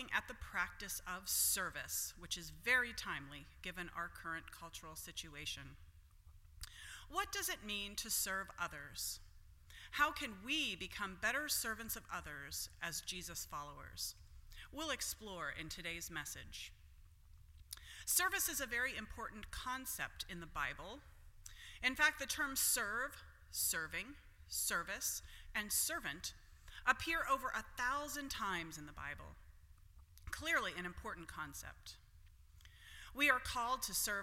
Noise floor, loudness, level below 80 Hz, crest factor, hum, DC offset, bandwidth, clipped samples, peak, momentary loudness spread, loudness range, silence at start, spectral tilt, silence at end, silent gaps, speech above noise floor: -63 dBFS; -40 LUFS; -60 dBFS; 26 dB; none; under 0.1%; 16.5 kHz; under 0.1%; -16 dBFS; 18 LU; 7 LU; 0 s; -1 dB/octave; 0 s; none; 21 dB